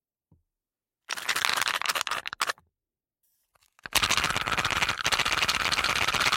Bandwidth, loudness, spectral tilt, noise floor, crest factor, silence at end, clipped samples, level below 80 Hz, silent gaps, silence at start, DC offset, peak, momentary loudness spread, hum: 17 kHz; -26 LUFS; -0.5 dB/octave; under -90 dBFS; 24 dB; 0 s; under 0.1%; -52 dBFS; none; 1.1 s; under 0.1%; -4 dBFS; 7 LU; none